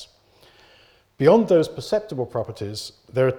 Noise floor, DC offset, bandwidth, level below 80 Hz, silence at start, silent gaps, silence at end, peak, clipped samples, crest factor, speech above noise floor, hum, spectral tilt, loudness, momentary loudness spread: -56 dBFS; under 0.1%; 16 kHz; -58 dBFS; 0 s; none; 0 s; -4 dBFS; under 0.1%; 20 dB; 35 dB; none; -6.5 dB/octave; -21 LUFS; 14 LU